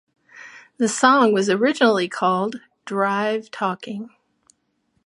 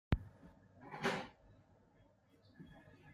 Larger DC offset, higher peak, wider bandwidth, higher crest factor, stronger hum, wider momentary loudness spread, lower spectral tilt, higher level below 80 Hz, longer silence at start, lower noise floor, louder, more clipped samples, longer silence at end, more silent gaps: neither; first, -2 dBFS vs -18 dBFS; second, 11.5 kHz vs 15 kHz; second, 20 dB vs 28 dB; neither; second, 19 LU vs 22 LU; second, -4 dB/octave vs -6 dB/octave; second, -74 dBFS vs -54 dBFS; first, 0.35 s vs 0.1 s; about the same, -69 dBFS vs -70 dBFS; first, -20 LUFS vs -43 LUFS; neither; first, 1 s vs 0 s; neither